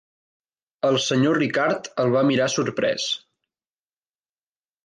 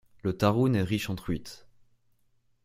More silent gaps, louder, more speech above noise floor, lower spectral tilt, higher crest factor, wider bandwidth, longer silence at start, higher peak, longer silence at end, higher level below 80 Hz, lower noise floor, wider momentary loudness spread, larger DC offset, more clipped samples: neither; first, -22 LUFS vs -28 LUFS; first, over 69 dB vs 41 dB; second, -4.5 dB/octave vs -7 dB/octave; second, 16 dB vs 22 dB; second, 10 kHz vs 16 kHz; first, 0.85 s vs 0.25 s; about the same, -8 dBFS vs -8 dBFS; first, 1.7 s vs 1.1 s; second, -68 dBFS vs -54 dBFS; first, under -90 dBFS vs -68 dBFS; second, 6 LU vs 11 LU; neither; neither